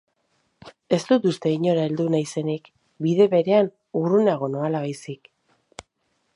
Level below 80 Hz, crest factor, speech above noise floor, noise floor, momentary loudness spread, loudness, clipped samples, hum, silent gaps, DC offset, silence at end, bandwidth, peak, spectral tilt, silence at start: -68 dBFS; 18 dB; 50 dB; -71 dBFS; 12 LU; -22 LUFS; under 0.1%; none; none; under 0.1%; 1.2 s; 11.5 kHz; -6 dBFS; -7 dB/octave; 0.65 s